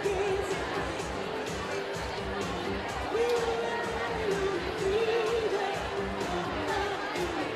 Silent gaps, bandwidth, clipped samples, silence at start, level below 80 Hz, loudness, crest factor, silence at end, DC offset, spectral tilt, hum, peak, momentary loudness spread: none; 14.5 kHz; under 0.1%; 0 s; -48 dBFS; -31 LUFS; 14 dB; 0 s; under 0.1%; -4.5 dB/octave; none; -18 dBFS; 6 LU